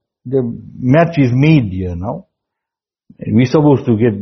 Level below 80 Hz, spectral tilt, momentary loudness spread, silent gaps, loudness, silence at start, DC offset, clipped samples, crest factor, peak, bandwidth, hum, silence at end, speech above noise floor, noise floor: -46 dBFS; -8 dB/octave; 13 LU; none; -14 LUFS; 0.25 s; under 0.1%; under 0.1%; 14 dB; 0 dBFS; 6.4 kHz; none; 0 s; 72 dB; -85 dBFS